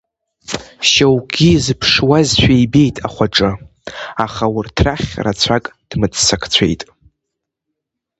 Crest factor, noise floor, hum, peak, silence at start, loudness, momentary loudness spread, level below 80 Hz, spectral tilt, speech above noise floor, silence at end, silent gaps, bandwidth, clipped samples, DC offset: 16 dB; -78 dBFS; none; 0 dBFS; 0.5 s; -14 LUFS; 14 LU; -34 dBFS; -4.5 dB/octave; 64 dB; 1.35 s; none; 8.8 kHz; under 0.1%; under 0.1%